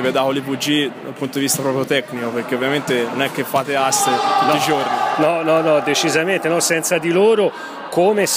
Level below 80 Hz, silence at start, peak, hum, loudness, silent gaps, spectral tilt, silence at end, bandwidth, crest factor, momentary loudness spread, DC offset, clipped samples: -66 dBFS; 0 s; -2 dBFS; none; -17 LUFS; none; -3.5 dB/octave; 0 s; 15.5 kHz; 14 dB; 6 LU; under 0.1%; under 0.1%